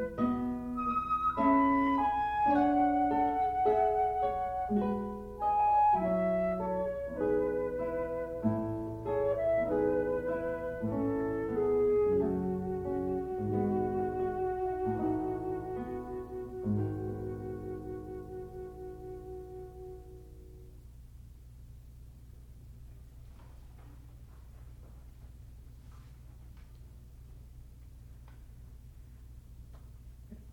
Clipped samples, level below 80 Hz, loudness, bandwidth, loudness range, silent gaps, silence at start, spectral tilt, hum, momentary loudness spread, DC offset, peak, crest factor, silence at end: under 0.1%; -52 dBFS; -32 LUFS; 16 kHz; 25 LU; none; 0 s; -9 dB/octave; 60 Hz at -50 dBFS; 26 LU; under 0.1%; -16 dBFS; 16 dB; 0 s